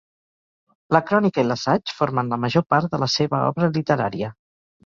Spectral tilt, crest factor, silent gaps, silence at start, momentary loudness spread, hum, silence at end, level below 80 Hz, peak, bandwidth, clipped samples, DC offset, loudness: -6 dB/octave; 20 dB; 2.66-2.70 s; 0.9 s; 4 LU; none; 0.55 s; -58 dBFS; -2 dBFS; 7.4 kHz; under 0.1%; under 0.1%; -21 LUFS